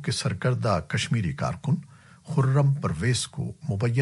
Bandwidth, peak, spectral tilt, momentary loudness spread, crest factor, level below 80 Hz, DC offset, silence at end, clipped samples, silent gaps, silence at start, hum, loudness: 11.5 kHz; -10 dBFS; -5.5 dB/octave; 7 LU; 16 dB; -52 dBFS; under 0.1%; 0 s; under 0.1%; none; 0 s; none; -26 LUFS